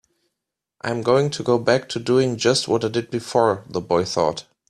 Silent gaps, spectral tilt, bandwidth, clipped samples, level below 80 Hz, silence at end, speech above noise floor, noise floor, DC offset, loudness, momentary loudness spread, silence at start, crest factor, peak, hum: none; -5 dB/octave; 13.5 kHz; under 0.1%; -58 dBFS; 0.3 s; 62 dB; -83 dBFS; under 0.1%; -21 LUFS; 6 LU; 0.85 s; 18 dB; -4 dBFS; none